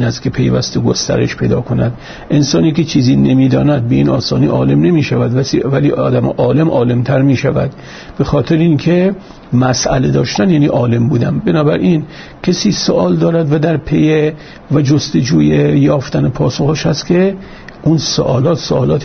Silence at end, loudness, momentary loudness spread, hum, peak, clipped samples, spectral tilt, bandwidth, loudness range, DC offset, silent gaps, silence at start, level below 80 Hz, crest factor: 0 s; -12 LUFS; 6 LU; none; -2 dBFS; under 0.1%; -6.5 dB/octave; 6.6 kHz; 2 LU; under 0.1%; none; 0 s; -36 dBFS; 10 dB